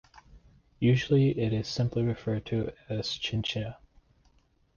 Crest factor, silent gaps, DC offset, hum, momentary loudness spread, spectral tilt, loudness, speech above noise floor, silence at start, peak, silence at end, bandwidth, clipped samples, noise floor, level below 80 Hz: 18 dB; none; under 0.1%; none; 10 LU; -6.5 dB/octave; -29 LUFS; 38 dB; 0.15 s; -12 dBFS; 1.05 s; 7.2 kHz; under 0.1%; -66 dBFS; -54 dBFS